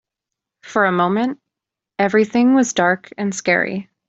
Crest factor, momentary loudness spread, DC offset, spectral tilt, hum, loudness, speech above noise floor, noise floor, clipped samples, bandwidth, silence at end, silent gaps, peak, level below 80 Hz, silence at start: 16 dB; 10 LU; under 0.1%; -5 dB/octave; none; -18 LUFS; 68 dB; -85 dBFS; under 0.1%; 8 kHz; 0.25 s; none; -2 dBFS; -62 dBFS; 0.65 s